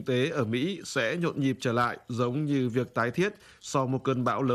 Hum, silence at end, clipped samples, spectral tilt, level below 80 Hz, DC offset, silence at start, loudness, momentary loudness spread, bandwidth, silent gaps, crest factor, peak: none; 0 s; under 0.1%; -6 dB/octave; -66 dBFS; under 0.1%; 0 s; -29 LUFS; 3 LU; 14 kHz; none; 16 dB; -12 dBFS